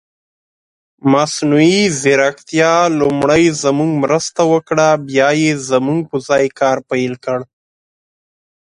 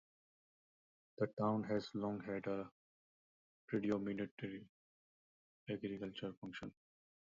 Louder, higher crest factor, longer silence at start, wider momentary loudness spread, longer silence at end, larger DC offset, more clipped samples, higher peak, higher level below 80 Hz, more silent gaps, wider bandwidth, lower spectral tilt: first, -14 LUFS vs -43 LUFS; second, 14 dB vs 22 dB; second, 1.05 s vs 1.2 s; second, 7 LU vs 12 LU; first, 1.2 s vs 0.5 s; neither; neither; first, 0 dBFS vs -24 dBFS; first, -52 dBFS vs -78 dBFS; second, none vs 1.33-1.37 s, 2.72-3.68 s, 4.31-4.37 s, 4.69-5.66 s, 6.37-6.42 s; first, 11.5 kHz vs 7.4 kHz; about the same, -5 dB/octave vs -6 dB/octave